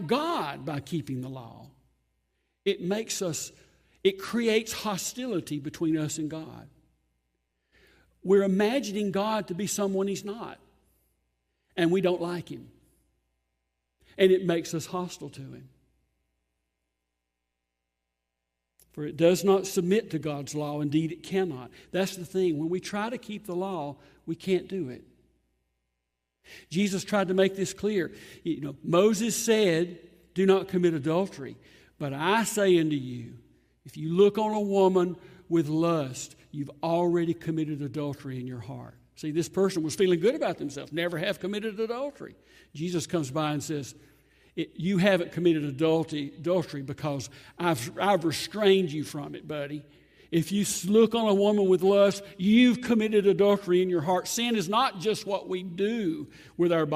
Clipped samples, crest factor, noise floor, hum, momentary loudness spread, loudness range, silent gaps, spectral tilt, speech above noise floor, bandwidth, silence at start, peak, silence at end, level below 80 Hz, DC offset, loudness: under 0.1%; 20 dB; -83 dBFS; none; 16 LU; 9 LU; none; -5 dB/octave; 57 dB; 15.5 kHz; 0 s; -8 dBFS; 0 s; -66 dBFS; under 0.1%; -27 LUFS